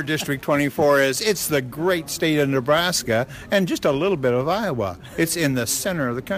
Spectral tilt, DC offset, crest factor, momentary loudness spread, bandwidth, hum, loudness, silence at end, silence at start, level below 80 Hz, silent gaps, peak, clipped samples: -4 dB/octave; under 0.1%; 14 dB; 6 LU; 15.5 kHz; none; -21 LUFS; 0 s; 0 s; -50 dBFS; none; -8 dBFS; under 0.1%